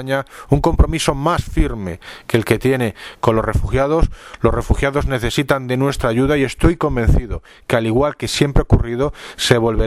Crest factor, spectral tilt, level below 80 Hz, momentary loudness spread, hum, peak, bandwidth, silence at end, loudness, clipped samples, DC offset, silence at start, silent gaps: 16 dB; -6 dB/octave; -24 dBFS; 6 LU; none; 0 dBFS; 15 kHz; 0 s; -18 LUFS; under 0.1%; under 0.1%; 0 s; none